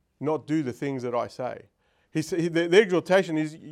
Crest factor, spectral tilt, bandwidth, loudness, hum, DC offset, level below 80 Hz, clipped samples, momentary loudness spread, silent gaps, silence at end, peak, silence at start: 20 dB; -5.5 dB/octave; 14.5 kHz; -26 LUFS; none; under 0.1%; -72 dBFS; under 0.1%; 13 LU; none; 0 s; -6 dBFS; 0.2 s